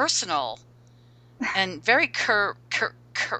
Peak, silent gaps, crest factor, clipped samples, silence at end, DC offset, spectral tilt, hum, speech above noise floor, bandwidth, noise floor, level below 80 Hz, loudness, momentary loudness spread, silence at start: -6 dBFS; none; 22 dB; under 0.1%; 0 s; under 0.1%; -1.5 dB/octave; 60 Hz at -50 dBFS; 29 dB; 9.4 kHz; -53 dBFS; -66 dBFS; -24 LUFS; 10 LU; 0 s